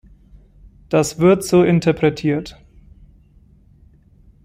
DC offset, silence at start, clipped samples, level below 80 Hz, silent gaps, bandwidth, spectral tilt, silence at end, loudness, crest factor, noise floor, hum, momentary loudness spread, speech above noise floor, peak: under 0.1%; 0.9 s; under 0.1%; -46 dBFS; none; 16 kHz; -6.5 dB/octave; 1.9 s; -17 LUFS; 16 dB; -50 dBFS; none; 9 LU; 34 dB; -4 dBFS